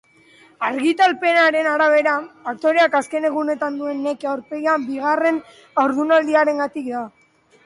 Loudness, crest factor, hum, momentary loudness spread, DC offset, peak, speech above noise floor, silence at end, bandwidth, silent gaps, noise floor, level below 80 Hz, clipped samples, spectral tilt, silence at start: -19 LUFS; 14 dB; none; 10 LU; under 0.1%; -6 dBFS; 32 dB; 0.55 s; 11.5 kHz; none; -51 dBFS; -70 dBFS; under 0.1%; -3.5 dB/octave; 0.6 s